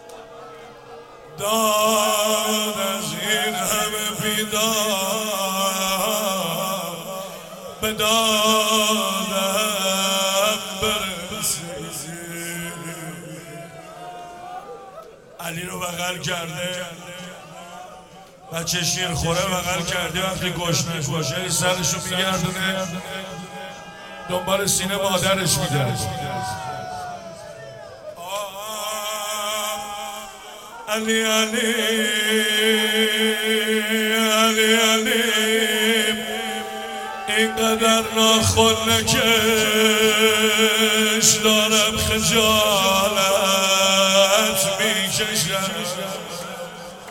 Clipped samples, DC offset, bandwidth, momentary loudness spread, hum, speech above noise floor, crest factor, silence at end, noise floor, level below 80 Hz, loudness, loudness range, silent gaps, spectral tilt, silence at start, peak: under 0.1%; under 0.1%; 17 kHz; 20 LU; none; 24 dB; 20 dB; 0 s; -44 dBFS; -50 dBFS; -19 LUFS; 13 LU; none; -2 dB/octave; 0 s; -2 dBFS